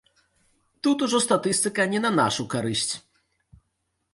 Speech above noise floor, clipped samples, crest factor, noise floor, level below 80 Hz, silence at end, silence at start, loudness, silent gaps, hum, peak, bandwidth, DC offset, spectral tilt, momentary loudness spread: 52 dB; under 0.1%; 20 dB; -76 dBFS; -62 dBFS; 1.15 s; 0.85 s; -24 LUFS; none; none; -6 dBFS; 12 kHz; under 0.1%; -3.5 dB/octave; 6 LU